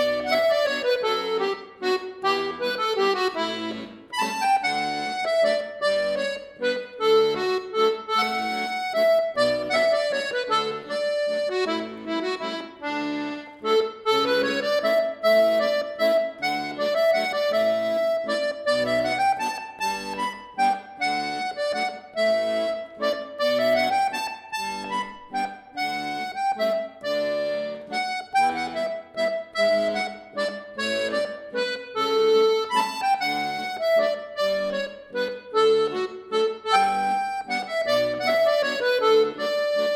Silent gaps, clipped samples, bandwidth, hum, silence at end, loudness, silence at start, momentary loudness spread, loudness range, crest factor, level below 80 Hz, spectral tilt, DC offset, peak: none; under 0.1%; 17 kHz; none; 0 s; -24 LUFS; 0 s; 9 LU; 4 LU; 18 dB; -66 dBFS; -3 dB/octave; under 0.1%; -6 dBFS